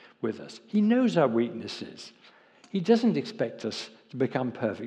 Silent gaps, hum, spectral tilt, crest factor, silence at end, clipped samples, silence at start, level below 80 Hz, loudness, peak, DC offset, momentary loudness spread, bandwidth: none; none; -6.5 dB/octave; 18 dB; 0 s; under 0.1%; 0.2 s; -82 dBFS; -28 LUFS; -10 dBFS; under 0.1%; 17 LU; 9.2 kHz